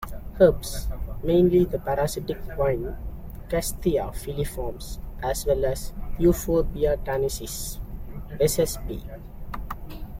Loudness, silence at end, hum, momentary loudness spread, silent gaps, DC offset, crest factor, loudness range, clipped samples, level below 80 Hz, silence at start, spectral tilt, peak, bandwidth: -25 LUFS; 0 s; none; 18 LU; none; under 0.1%; 20 dB; 5 LU; under 0.1%; -34 dBFS; 0 s; -5.5 dB/octave; -4 dBFS; 16.5 kHz